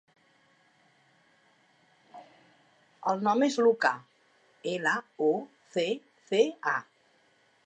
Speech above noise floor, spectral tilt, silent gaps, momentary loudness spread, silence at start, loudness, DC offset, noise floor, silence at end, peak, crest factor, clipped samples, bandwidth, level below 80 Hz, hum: 39 dB; -4.5 dB/octave; none; 11 LU; 2.15 s; -29 LUFS; under 0.1%; -66 dBFS; 0.85 s; -10 dBFS; 22 dB; under 0.1%; 8.8 kHz; -90 dBFS; none